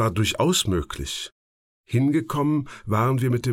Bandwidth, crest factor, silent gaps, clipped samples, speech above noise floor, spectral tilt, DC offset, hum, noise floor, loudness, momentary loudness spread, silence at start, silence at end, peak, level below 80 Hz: 16.5 kHz; 14 dB; 1.32-1.84 s; under 0.1%; over 67 dB; -5 dB/octave; under 0.1%; none; under -90 dBFS; -23 LUFS; 10 LU; 0 s; 0 s; -10 dBFS; -44 dBFS